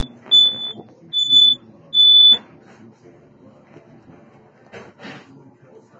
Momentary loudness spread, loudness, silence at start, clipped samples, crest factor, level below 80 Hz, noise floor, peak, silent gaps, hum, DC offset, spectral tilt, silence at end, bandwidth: 16 LU; -11 LUFS; 0 s; under 0.1%; 16 dB; -66 dBFS; -49 dBFS; -4 dBFS; none; none; under 0.1%; -1.5 dB/octave; 0.85 s; 7.6 kHz